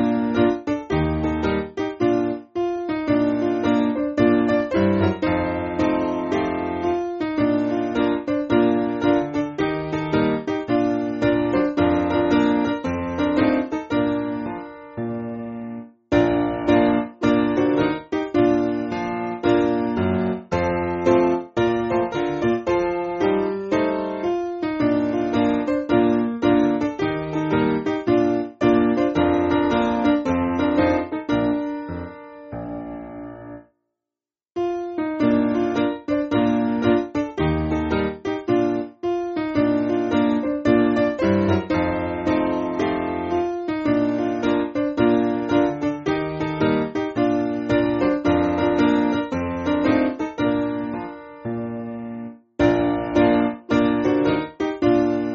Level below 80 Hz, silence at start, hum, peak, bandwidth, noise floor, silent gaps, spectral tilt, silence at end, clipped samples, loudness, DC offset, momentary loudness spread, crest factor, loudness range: -44 dBFS; 0 s; none; -4 dBFS; 7 kHz; -90 dBFS; none; -6 dB/octave; 0 s; under 0.1%; -21 LUFS; under 0.1%; 8 LU; 16 dB; 4 LU